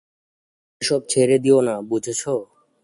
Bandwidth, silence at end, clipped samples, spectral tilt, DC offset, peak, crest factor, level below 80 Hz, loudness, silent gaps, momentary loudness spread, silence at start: 11.5 kHz; 0.4 s; under 0.1%; -4.5 dB/octave; under 0.1%; -4 dBFS; 16 dB; -64 dBFS; -20 LUFS; none; 10 LU; 0.8 s